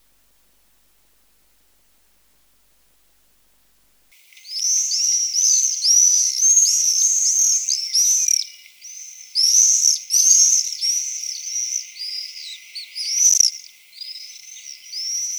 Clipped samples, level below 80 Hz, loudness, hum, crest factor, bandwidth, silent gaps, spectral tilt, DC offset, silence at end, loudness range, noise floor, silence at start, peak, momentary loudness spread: under 0.1%; -76 dBFS; -15 LUFS; none; 20 dB; over 20 kHz; none; 8.5 dB/octave; under 0.1%; 0 s; 7 LU; -61 dBFS; 4.45 s; 0 dBFS; 22 LU